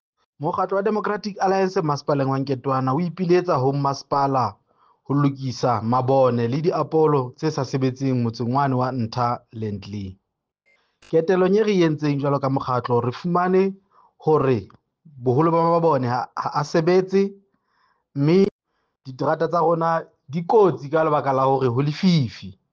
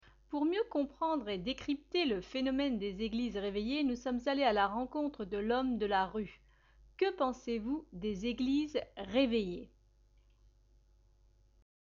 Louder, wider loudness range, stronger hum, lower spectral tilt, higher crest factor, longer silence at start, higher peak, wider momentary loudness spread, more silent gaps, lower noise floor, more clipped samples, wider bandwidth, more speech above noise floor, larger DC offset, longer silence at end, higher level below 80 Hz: first, -21 LUFS vs -35 LUFS; about the same, 2 LU vs 3 LU; neither; first, -7.5 dB/octave vs -5.5 dB/octave; about the same, 16 dB vs 18 dB; about the same, 0.4 s vs 0.3 s; first, -6 dBFS vs -18 dBFS; about the same, 9 LU vs 7 LU; first, 18.51-18.59 s vs none; about the same, -69 dBFS vs -67 dBFS; neither; about the same, 7.2 kHz vs 7.2 kHz; first, 48 dB vs 32 dB; neither; second, 0.2 s vs 2.3 s; about the same, -62 dBFS vs -60 dBFS